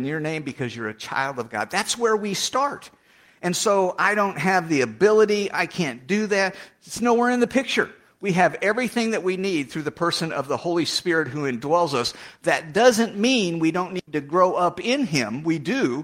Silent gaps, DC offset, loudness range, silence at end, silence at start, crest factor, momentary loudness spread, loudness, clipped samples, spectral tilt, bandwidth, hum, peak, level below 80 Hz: none; under 0.1%; 3 LU; 0 s; 0 s; 18 dB; 10 LU; -22 LUFS; under 0.1%; -4 dB/octave; 16 kHz; none; -4 dBFS; -64 dBFS